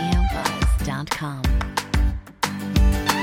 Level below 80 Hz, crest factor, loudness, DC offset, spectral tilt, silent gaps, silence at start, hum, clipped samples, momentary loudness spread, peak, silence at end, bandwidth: -24 dBFS; 16 dB; -23 LUFS; under 0.1%; -5 dB/octave; none; 0 s; none; under 0.1%; 6 LU; -4 dBFS; 0 s; 16.5 kHz